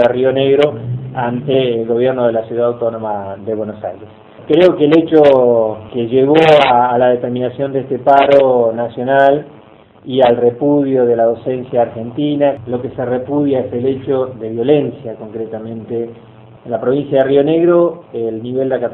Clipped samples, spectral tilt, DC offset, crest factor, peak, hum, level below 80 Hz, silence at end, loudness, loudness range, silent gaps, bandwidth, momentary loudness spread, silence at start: 0.2%; -8 dB/octave; under 0.1%; 14 dB; 0 dBFS; none; -54 dBFS; 0 s; -14 LUFS; 6 LU; none; 6.6 kHz; 14 LU; 0 s